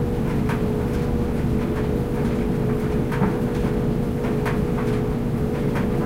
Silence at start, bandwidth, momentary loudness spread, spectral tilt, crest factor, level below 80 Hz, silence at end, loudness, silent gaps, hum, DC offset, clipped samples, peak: 0 s; 16 kHz; 1 LU; -8 dB/octave; 14 dB; -30 dBFS; 0 s; -23 LUFS; none; none; under 0.1%; under 0.1%; -8 dBFS